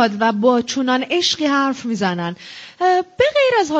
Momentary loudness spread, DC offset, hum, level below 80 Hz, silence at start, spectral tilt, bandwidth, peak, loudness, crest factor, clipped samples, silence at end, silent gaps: 9 LU; under 0.1%; none; -56 dBFS; 0 s; -4 dB/octave; 8.6 kHz; -2 dBFS; -17 LUFS; 14 dB; under 0.1%; 0 s; none